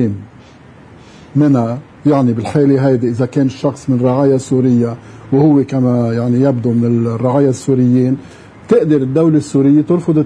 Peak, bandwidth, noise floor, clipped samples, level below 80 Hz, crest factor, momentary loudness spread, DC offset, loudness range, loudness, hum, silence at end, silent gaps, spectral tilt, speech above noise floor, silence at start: 0 dBFS; 10.5 kHz; -39 dBFS; under 0.1%; -52 dBFS; 12 dB; 6 LU; under 0.1%; 1 LU; -13 LUFS; none; 0 s; none; -8.5 dB/octave; 27 dB; 0 s